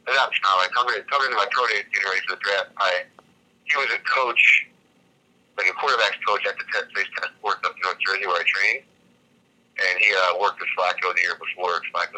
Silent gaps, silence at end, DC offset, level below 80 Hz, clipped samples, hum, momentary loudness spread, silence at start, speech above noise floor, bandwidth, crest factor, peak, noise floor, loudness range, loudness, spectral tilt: none; 0 s; under 0.1%; -82 dBFS; under 0.1%; none; 9 LU; 0.05 s; 39 dB; 12.5 kHz; 20 dB; -4 dBFS; -61 dBFS; 3 LU; -21 LUFS; 0 dB/octave